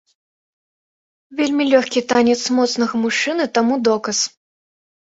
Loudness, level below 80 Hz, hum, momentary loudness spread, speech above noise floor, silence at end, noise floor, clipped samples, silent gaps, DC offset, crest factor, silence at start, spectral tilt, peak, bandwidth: -17 LUFS; -62 dBFS; none; 5 LU; over 73 dB; 0.8 s; under -90 dBFS; under 0.1%; none; under 0.1%; 18 dB; 1.3 s; -3 dB/octave; 0 dBFS; 8 kHz